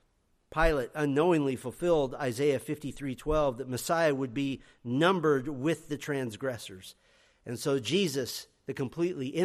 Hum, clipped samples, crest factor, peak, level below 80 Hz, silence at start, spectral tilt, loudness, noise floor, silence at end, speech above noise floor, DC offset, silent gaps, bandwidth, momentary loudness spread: none; under 0.1%; 18 dB; -12 dBFS; -46 dBFS; 0.5 s; -5.5 dB/octave; -30 LUFS; -71 dBFS; 0 s; 41 dB; under 0.1%; none; 15 kHz; 12 LU